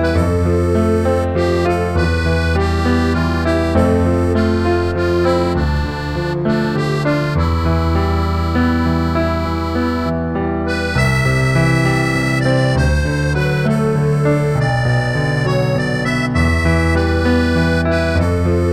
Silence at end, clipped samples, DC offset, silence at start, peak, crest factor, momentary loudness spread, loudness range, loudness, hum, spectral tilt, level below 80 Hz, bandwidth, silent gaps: 0 s; under 0.1%; under 0.1%; 0 s; -2 dBFS; 14 dB; 4 LU; 2 LU; -16 LUFS; none; -7 dB/octave; -26 dBFS; 13.5 kHz; none